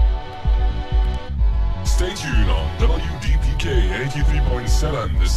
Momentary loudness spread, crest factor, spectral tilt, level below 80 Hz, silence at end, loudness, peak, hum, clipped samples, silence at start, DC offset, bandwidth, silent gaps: 3 LU; 14 dB; -5.5 dB/octave; -18 dBFS; 0 s; -21 LUFS; -4 dBFS; none; under 0.1%; 0 s; under 0.1%; 13 kHz; none